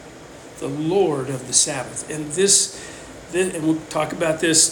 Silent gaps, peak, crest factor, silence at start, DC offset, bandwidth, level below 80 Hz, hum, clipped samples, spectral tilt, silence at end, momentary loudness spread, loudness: none; -2 dBFS; 20 dB; 0 s; under 0.1%; 18 kHz; -54 dBFS; none; under 0.1%; -2.5 dB/octave; 0 s; 21 LU; -20 LUFS